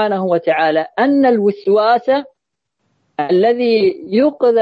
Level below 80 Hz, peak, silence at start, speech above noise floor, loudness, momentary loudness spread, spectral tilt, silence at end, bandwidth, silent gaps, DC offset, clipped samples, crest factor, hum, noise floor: -64 dBFS; -2 dBFS; 0 s; 61 dB; -14 LUFS; 5 LU; -8 dB/octave; 0 s; 5.2 kHz; none; under 0.1%; under 0.1%; 12 dB; none; -74 dBFS